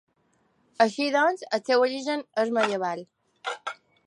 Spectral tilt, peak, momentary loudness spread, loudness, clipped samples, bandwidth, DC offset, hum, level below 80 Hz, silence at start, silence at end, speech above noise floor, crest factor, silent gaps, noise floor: -3.5 dB/octave; -6 dBFS; 13 LU; -26 LUFS; under 0.1%; 11.5 kHz; under 0.1%; none; -82 dBFS; 0.8 s; 0.35 s; 44 dB; 20 dB; none; -68 dBFS